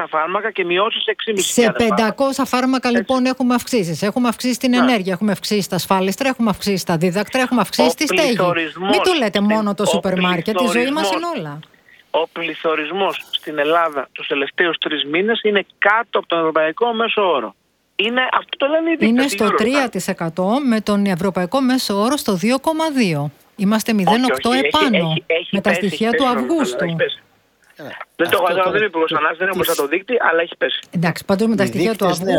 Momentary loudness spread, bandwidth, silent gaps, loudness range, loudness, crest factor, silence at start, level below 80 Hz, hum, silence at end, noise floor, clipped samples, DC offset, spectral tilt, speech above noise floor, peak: 6 LU; 19 kHz; none; 3 LU; -17 LUFS; 18 dB; 0 s; -54 dBFS; none; 0 s; -55 dBFS; under 0.1%; under 0.1%; -4.5 dB/octave; 38 dB; 0 dBFS